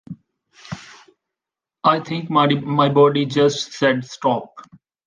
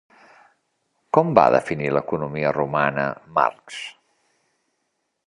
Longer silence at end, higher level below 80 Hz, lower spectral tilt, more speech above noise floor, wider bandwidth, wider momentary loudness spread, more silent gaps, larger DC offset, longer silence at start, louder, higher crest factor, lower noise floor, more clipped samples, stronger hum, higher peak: second, 0.45 s vs 1.4 s; about the same, -62 dBFS vs -58 dBFS; about the same, -5.5 dB/octave vs -6.5 dB/octave; first, 69 dB vs 54 dB; second, 9.4 kHz vs 11 kHz; about the same, 20 LU vs 18 LU; neither; neither; second, 0.1 s vs 1.15 s; first, -18 LUFS vs -21 LUFS; about the same, 18 dB vs 22 dB; first, -87 dBFS vs -74 dBFS; neither; neither; about the same, -2 dBFS vs 0 dBFS